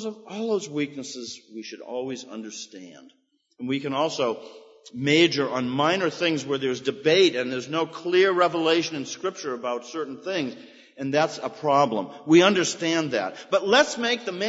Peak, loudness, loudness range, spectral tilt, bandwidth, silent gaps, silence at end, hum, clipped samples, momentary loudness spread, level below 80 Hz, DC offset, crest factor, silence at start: -4 dBFS; -24 LUFS; 10 LU; -4 dB/octave; 8 kHz; none; 0 s; none; under 0.1%; 17 LU; -76 dBFS; under 0.1%; 22 dB; 0 s